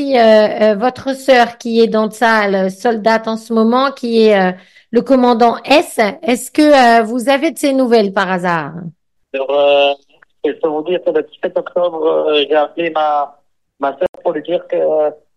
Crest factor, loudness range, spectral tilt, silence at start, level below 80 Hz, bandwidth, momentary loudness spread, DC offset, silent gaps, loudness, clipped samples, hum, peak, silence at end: 12 dB; 5 LU; -5 dB/octave; 0 s; -56 dBFS; 12.5 kHz; 10 LU; 0.1%; 14.09-14.13 s; -13 LUFS; under 0.1%; none; 0 dBFS; 0.2 s